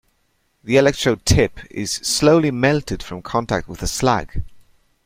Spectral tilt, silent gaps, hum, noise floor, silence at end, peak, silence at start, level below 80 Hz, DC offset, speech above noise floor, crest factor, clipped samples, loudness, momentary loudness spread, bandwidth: -4.5 dB/octave; none; none; -65 dBFS; 0.45 s; -2 dBFS; 0.65 s; -36 dBFS; under 0.1%; 47 dB; 18 dB; under 0.1%; -19 LUFS; 14 LU; 16 kHz